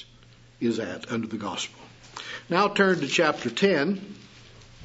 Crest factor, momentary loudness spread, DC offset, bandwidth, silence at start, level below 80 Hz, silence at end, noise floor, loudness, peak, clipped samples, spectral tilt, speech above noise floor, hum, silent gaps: 22 dB; 16 LU; under 0.1%; 8 kHz; 0 s; -62 dBFS; 0 s; -53 dBFS; -25 LUFS; -6 dBFS; under 0.1%; -4.5 dB/octave; 27 dB; none; none